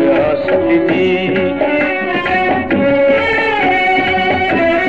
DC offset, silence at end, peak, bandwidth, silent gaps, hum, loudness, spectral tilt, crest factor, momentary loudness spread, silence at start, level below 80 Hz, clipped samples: 0.9%; 0 s; -2 dBFS; 7.8 kHz; none; none; -13 LUFS; -7 dB/octave; 10 dB; 3 LU; 0 s; -42 dBFS; under 0.1%